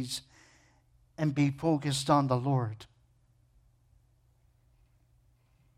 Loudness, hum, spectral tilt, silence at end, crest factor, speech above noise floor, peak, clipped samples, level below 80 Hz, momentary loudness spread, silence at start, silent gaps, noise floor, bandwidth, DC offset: -30 LUFS; none; -6 dB/octave; 2.95 s; 22 dB; 38 dB; -12 dBFS; under 0.1%; -64 dBFS; 13 LU; 0 s; none; -67 dBFS; 15 kHz; under 0.1%